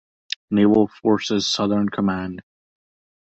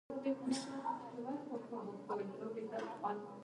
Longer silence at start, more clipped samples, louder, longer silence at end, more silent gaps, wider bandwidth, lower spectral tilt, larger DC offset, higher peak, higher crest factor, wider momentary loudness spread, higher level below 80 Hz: first, 0.5 s vs 0.1 s; neither; first, -20 LUFS vs -43 LUFS; first, 0.8 s vs 0 s; neither; second, 8 kHz vs 11.5 kHz; about the same, -5.5 dB/octave vs -5 dB/octave; neither; first, -4 dBFS vs -26 dBFS; about the same, 16 dB vs 16 dB; first, 14 LU vs 5 LU; first, -54 dBFS vs -86 dBFS